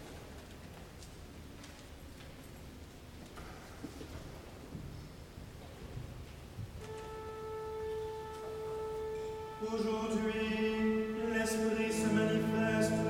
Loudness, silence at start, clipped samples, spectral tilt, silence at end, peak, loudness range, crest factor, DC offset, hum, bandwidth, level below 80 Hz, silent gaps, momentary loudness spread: -37 LUFS; 0 s; under 0.1%; -5.5 dB/octave; 0 s; -20 dBFS; 17 LU; 18 dB; under 0.1%; none; 17 kHz; -56 dBFS; none; 19 LU